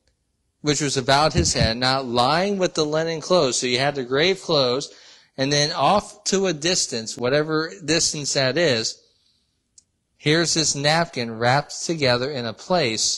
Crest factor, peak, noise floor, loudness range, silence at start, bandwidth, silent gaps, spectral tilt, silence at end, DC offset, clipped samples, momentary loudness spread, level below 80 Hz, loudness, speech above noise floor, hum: 18 dB; -4 dBFS; -71 dBFS; 3 LU; 0.65 s; 12 kHz; none; -3.5 dB/octave; 0 s; under 0.1%; under 0.1%; 7 LU; -44 dBFS; -21 LUFS; 50 dB; none